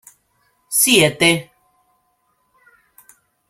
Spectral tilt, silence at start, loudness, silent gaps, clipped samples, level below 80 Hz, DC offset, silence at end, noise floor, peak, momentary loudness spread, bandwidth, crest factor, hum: -2.5 dB/octave; 0.7 s; -14 LUFS; none; under 0.1%; -60 dBFS; under 0.1%; 2.05 s; -65 dBFS; 0 dBFS; 9 LU; 16.5 kHz; 22 dB; none